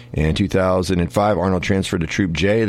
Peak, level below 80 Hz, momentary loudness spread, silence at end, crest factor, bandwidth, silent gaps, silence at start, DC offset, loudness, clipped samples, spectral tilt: -4 dBFS; -34 dBFS; 3 LU; 0 s; 14 dB; 14.5 kHz; none; 0 s; under 0.1%; -19 LUFS; under 0.1%; -6 dB/octave